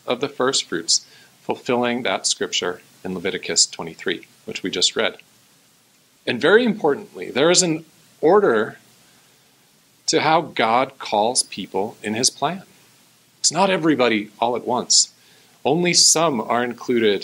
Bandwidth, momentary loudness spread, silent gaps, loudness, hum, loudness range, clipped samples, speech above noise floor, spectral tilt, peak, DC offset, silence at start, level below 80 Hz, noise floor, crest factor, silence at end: 16 kHz; 12 LU; none; -19 LUFS; none; 4 LU; under 0.1%; 37 dB; -2.5 dB/octave; -2 dBFS; under 0.1%; 0.05 s; -70 dBFS; -57 dBFS; 20 dB; 0 s